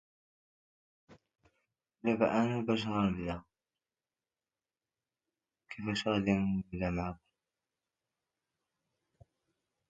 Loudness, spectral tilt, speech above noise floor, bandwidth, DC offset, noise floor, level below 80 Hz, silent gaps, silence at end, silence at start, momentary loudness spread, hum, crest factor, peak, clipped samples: -33 LUFS; -6.5 dB/octave; over 58 dB; 7.8 kHz; under 0.1%; under -90 dBFS; -58 dBFS; none; 2.75 s; 1.1 s; 12 LU; none; 24 dB; -14 dBFS; under 0.1%